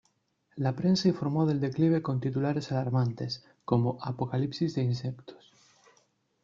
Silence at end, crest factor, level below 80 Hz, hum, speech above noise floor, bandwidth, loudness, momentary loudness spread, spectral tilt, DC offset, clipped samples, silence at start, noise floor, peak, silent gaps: 1.1 s; 20 dB; -64 dBFS; none; 44 dB; 7.4 kHz; -29 LUFS; 10 LU; -7.5 dB/octave; under 0.1%; under 0.1%; 0.55 s; -72 dBFS; -10 dBFS; none